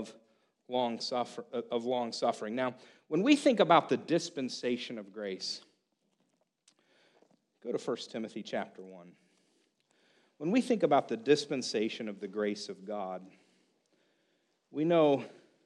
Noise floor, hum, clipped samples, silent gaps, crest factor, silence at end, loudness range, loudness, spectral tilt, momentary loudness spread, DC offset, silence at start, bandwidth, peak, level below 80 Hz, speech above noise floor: -77 dBFS; none; under 0.1%; none; 24 dB; 0.35 s; 12 LU; -32 LUFS; -5 dB/octave; 15 LU; under 0.1%; 0 s; 11.5 kHz; -10 dBFS; -84 dBFS; 45 dB